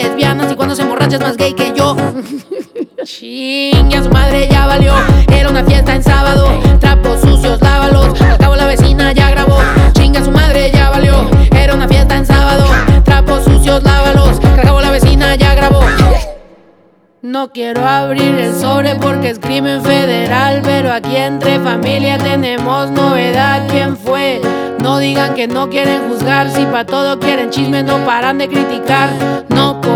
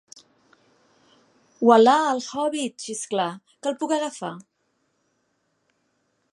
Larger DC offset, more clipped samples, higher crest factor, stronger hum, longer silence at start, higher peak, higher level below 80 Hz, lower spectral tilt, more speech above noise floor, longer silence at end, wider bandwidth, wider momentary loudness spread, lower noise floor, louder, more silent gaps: neither; neither; second, 8 dB vs 24 dB; neither; second, 0 s vs 1.6 s; about the same, 0 dBFS vs -2 dBFS; first, -14 dBFS vs -80 dBFS; first, -6 dB/octave vs -4 dB/octave; second, 39 dB vs 50 dB; second, 0 s vs 1.9 s; first, 16 kHz vs 11.5 kHz; second, 6 LU vs 16 LU; second, -48 dBFS vs -71 dBFS; first, -10 LUFS vs -22 LUFS; neither